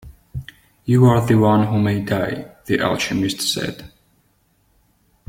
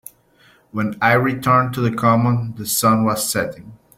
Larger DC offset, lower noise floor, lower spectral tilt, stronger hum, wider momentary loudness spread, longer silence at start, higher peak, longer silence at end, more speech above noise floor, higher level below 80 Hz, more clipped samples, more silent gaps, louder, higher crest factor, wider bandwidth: neither; first, -61 dBFS vs -54 dBFS; about the same, -6 dB/octave vs -5 dB/octave; neither; first, 20 LU vs 9 LU; second, 0.05 s vs 0.75 s; about the same, -2 dBFS vs -2 dBFS; first, 1.4 s vs 0.2 s; first, 44 dB vs 36 dB; first, -48 dBFS vs -54 dBFS; neither; neither; about the same, -18 LUFS vs -18 LUFS; about the same, 18 dB vs 16 dB; about the same, 16.5 kHz vs 16.5 kHz